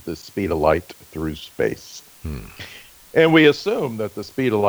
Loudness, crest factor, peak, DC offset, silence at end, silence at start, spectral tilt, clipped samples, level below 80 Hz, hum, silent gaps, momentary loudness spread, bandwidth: -20 LUFS; 18 dB; -2 dBFS; under 0.1%; 0 s; 0.05 s; -6 dB/octave; under 0.1%; -42 dBFS; none; none; 22 LU; over 20 kHz